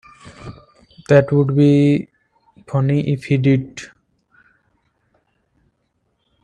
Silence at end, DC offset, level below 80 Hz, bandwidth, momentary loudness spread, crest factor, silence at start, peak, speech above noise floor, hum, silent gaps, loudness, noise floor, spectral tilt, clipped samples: 2.55 s; under 0.1%; -54 dBFS; 9.2 kHz; 25 LU; 18 dB; 0.25 s; 0 dBFS; 53 dB; none; none; -16 LUFS; -68 dBFS; -8.5 dB/octave; under 0.1%